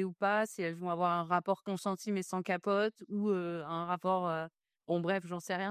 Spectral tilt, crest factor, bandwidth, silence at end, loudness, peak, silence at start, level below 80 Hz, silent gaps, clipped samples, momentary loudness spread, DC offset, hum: -6 dB/octave; 18 dB; 15 kHz; 0 s; -34 LUFS; -16 dBFS; 0 s; -84 dBFS; none; under 0.1%; 6 LU; under 0.1%; none